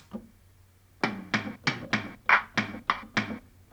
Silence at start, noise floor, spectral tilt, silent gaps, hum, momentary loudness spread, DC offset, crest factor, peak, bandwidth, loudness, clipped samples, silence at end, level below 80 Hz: 0.1 s; -59 dBFS; -4 dB/octave; none; none; 15 LU; under 0.1%; 24 dB; -6 dBFS; over 20 kHz; -29 LUFS; under 0.1%; 0.3 s; -60 dBFS